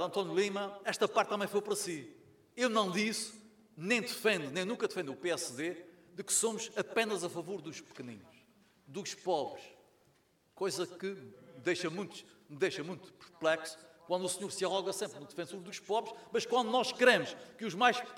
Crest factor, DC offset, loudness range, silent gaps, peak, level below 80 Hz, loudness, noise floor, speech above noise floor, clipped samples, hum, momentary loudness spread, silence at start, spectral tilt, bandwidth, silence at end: 24 dB; under 0.1%; 8 LU; none; -12 dBFS; -82 dBFS; -34 LUFS; -71 dBFS; 36 dB; under 0.1%; none; 16 LU; 0 s; -3 dB/octave; 18 kHz; 0 s